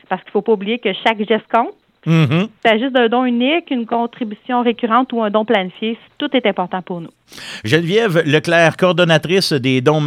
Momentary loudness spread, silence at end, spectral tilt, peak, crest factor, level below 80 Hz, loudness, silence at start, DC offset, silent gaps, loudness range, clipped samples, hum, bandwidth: 11 LU; 0 s; -6 dB/octave; 0 dBFS; 16 dB; -64 dBFS; -16 LUFS; 0.1 s; under 0.1%; none; 3 LU; under 0.1%; none; 15 kHz